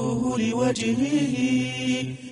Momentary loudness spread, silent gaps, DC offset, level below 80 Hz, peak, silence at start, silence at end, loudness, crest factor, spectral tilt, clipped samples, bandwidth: 3 LU; none; under 0.1%; -56 dBFS; -10 dBFS; 0 s; 0 s; -24 LUFS; 14 dB; -5 dB/octave; under 0.1%; 11.5 kHz